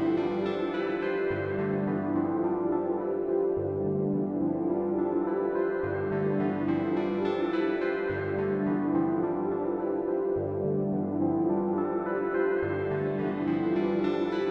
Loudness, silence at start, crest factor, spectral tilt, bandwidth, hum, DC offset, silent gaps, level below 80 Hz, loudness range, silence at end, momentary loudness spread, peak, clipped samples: -29 LUFS; 0 s; 12 dB; -9.5 dB/octave; 5.6 kHz; none; under 0.1%; none; -62 dBFS; 1 LU; 0 s; 3 LU; -16 dBFS; under 0.1%